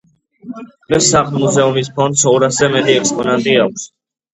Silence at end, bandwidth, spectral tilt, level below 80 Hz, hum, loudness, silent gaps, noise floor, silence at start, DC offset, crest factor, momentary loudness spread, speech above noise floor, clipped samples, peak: 0.5 s; 9 kHz; -3.5 dB/octave; -50 dBFS; none; -13 LUFS; none; -33 dBFS; 0.45 s; under 0.1%; 14 dB; 20 LU; 20 dB; under 0.1%; 0 dBFS